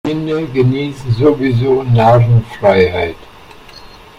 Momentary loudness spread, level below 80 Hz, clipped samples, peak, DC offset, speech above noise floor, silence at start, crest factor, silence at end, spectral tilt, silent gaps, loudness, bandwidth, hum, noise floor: 9 LU; -38 dBFS; under 0.1%; 0 dBFS; under 0.1%; 25 dB; 0.05 s; 14 dB; 0.35 s; -8.5 dB/octave; none; -13 LUFS; 7.2 kHz; none; -37 dBFS